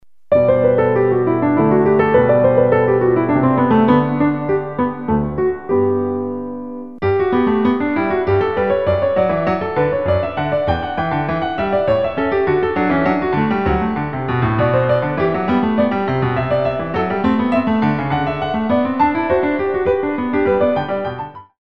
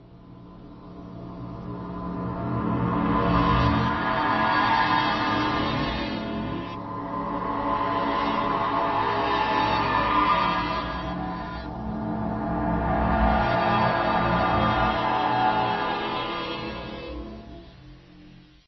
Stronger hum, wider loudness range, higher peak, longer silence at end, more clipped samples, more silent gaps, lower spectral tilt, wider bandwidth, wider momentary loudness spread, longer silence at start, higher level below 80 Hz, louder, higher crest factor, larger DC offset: neither; about the same, 4 LU vs 4 LU; first, 0 dBFS vs -8 dBFS; second, 0.15 s vs 0.35 s; neither; neither; first, -9.5 dB/octave vs -4 dB/octave; second, 5.6 kHz vs 6.2 kHz; second, 6 LU vs 15 LU; first, 0.3 s vs 0 s; about the same, -40 dBFS vs -38 dBFS; first, -17 LUFS vs -25 LUFS; about the same, 16 dB vs 16 dB; first, 0.9% vs under 0.1%